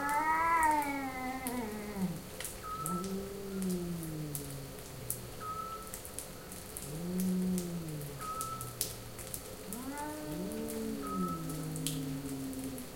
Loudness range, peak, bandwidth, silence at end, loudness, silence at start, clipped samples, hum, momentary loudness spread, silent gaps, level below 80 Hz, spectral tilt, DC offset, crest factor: 5 LU; -8 dBFS; 17 kHz; 0 s; -37 LUFS; 0 s; under 0.1%; none; 11 LU; none; -56 dBFS; -4.5 dB/octave; under 0.1%; 28 dB